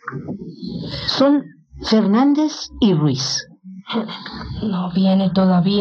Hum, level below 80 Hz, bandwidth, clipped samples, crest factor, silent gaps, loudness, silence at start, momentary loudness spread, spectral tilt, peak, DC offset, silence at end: none; -46 dBFS; 7 kHz; under 0.1%; 14 dB; none; -18 LUFS; 0.05 s; 15 LU; -6 dB/octave; -4 dBFS; under 0.1%; 0 s